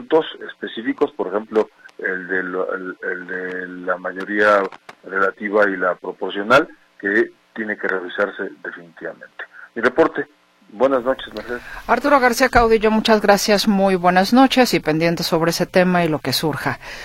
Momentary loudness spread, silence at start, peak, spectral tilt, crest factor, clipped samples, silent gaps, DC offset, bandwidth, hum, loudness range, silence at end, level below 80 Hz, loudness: 15 LU; 0 s; 0 dBFS; -4.5 dB/octave; 18 dB; under 0.1%; none; under 0.1%; 16.5 kHz; none; 8 LU; 0 s; -44 dBFS; -18 LUFS